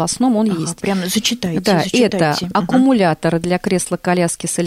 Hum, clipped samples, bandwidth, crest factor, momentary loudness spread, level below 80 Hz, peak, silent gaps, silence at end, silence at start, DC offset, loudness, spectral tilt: none; under 0.1%; 15.5 kHz; 12 dB; 5 LU; -48 dBFS; -4 dBFS; none; 0 s; 0 s; under 0.1%; -16 LUFS; -4.5 dB/octave